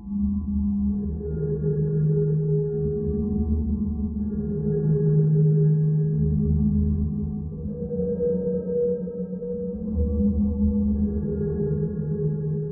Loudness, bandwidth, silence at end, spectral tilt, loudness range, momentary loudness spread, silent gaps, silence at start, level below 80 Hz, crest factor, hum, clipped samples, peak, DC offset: -24 LUFS; 1.8 kHz; 0 s; -17 dB/octave; 4 LU; 8 LU; none; 0 s; -34 dBFS; 12 dB; none; under 0.1%; -12 dBFS; under 0.1%